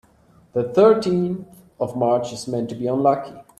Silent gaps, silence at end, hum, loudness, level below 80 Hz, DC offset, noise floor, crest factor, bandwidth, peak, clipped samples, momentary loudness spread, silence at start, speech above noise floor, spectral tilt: none; 0.15 s; none; -21 LUFS; -58 dBFS; under 0.1%; -54 dBFS; 18 dB; 13 kHz; -4 dBFS; under 0.1%; 13 LU; 0.55 s; 35 dB; -7 dB/octave